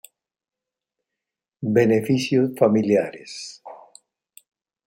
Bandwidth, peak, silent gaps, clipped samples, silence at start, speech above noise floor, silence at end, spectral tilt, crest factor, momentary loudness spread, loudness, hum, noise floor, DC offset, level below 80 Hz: 16.5 kHz; -4 dBFS; none; under 0.1%; 1.6 s; 66 dB; 1.1 s; -6.5 dB/octave; 20 dB; 17 LU; -20 LUFS; none; -86 dBFS; under 0.1%; -66 dBFS